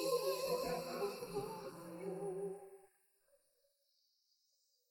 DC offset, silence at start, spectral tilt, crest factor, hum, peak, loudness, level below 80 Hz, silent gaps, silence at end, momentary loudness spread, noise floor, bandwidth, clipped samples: under 0.1%; 0 s; -4 dB/octave; 18 dB; none; -26 dBFS; -43 LUFS; -74 dBFS; none; 2.05 s; 12 LU; -80 dBFS; 17.5 kHz; under 0.1%